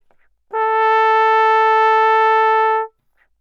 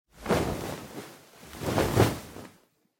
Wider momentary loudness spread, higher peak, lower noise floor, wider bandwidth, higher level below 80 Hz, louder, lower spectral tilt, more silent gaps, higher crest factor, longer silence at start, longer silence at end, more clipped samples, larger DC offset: second, 9 LU vs 22 LU; first, -2 dBFS vs -10 dBFS; about the same, -61 dBFS vs -62 dBFS; second, 7 kHz vs 17 kHz; second, -70 dBFS vs -46 dBFS; first, -14 LUFS vs -29 LUFS; second, 0 dB/octave vs -5.5 dB/octave; neither; second, 12 dB vs 20 dB; first, 0.55 s vs 0.15 s; about the same, 0.55 s vs 0.5 s; neither; neither